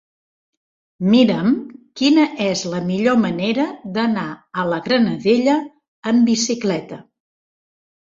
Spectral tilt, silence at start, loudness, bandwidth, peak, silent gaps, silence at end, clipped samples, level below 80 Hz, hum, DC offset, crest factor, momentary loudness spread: -5 dB/octave; 1 s; -18 LUFS; 7.6 kHz; -2 dBFS; 5.88-6.03 s; 1 s; under 0.1%; -60 dBFS; none; under 0.1%; 16 dB; 11 LU